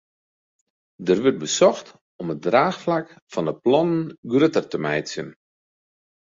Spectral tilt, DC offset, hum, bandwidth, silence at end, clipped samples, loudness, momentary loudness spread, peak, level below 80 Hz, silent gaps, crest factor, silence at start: -5 dB/octave; under 0.1%; none; 7.8 kHz; 0.95 s; under 0.1%; -22 LUFS; 13 LU; -4 dBFS; -64 dBFS; 2.01-2.19 s, 3.22-3.27 s, 4.18-4.23 s; 20 dB; 1 s